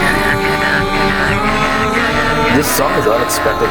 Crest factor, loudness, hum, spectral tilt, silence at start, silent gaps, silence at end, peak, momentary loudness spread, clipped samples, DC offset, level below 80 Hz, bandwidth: 12 dB; -13 LUFS; none; -4 dB/octave; 0 s; none; 0 s; 0 dBFS; 1 LU; under 0.1%; under 0.1%; -28 dBFS; over 20 kHz